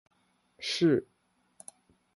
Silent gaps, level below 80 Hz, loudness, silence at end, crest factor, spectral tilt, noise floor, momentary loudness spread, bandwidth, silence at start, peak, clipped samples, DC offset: none; -72 dBFS; -29 LUFS; 1.15 s; 18 dB; -5 dB/octave; -67 dBFS; 24 LU; 11.5 kHz; 0.6 s; -16 dBFS; under 0.1%; under 0.1%